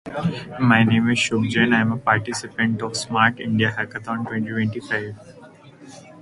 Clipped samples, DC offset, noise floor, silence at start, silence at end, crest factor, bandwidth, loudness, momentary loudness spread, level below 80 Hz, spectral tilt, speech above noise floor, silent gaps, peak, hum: under 0.1%; under 0.1%; -45 dBFS; 0.05 s; 0 s; 20 dB; 11.5 kHz; -21 LUFS; 10 LU; -54 dBFS; -5 dB/octave; 24 dB; none; -2 dBFS; none